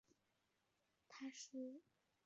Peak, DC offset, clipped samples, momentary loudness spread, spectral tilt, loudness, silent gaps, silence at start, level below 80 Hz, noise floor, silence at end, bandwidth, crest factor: -42 dBFS; under 0.1%; under 0.1%; 12 LU; -2 dB/octave; -55 LUFS; none; 0.1 s; under -90 dBFS; -86 dBFS; 0.45 s; 7.6 kHz; 16 dB